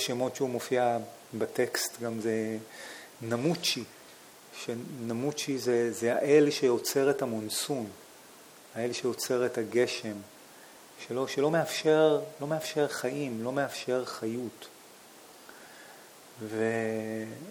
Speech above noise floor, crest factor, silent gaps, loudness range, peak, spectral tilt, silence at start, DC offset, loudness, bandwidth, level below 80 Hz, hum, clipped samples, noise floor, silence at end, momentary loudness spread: 23 dB; 20 dB; none; 8 LU; -12 dBFS; -4 dB/octave; 0 s; under 0.1%; -30 LUFS; 20 kHz; -80 dBFS; none; under 0.1%; -53 dBFS; 0 s; 24 LU